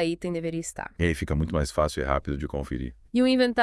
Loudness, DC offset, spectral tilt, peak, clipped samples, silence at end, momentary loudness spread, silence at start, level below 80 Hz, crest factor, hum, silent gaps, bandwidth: -27 LUFS; under 0.1%; -5.5 dB/octave; -6 dBFS; under 0.1%; 0 s; 10 LU; 0 s; -38 dBFS; 20 dB; none; none; 12 kHz